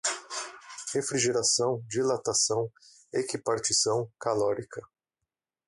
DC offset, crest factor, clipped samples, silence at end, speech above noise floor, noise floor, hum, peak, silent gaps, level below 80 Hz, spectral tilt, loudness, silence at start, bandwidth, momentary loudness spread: under 0.1%; 18 dB; under 0.1%; 0.8 s; 59 dB; -88 dBFS; none; -12 dBFS; none; -68 dBFS; -2.5 dB/octave; -28 LUFS; 0.05 s; 11.5 kHz; 13 LU